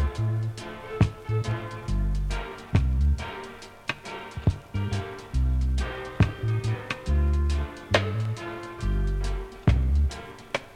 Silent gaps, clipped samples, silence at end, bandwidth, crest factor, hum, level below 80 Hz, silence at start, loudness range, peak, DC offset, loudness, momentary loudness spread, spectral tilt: none; under 0.1%; 0 s; 10.5 kHz; 22 dB; none; -30 dBFS; 0 s; 2 LU; -6 dBFS; under 0.1%; -28 LUFS; 10 LU; -6.5 dB/octave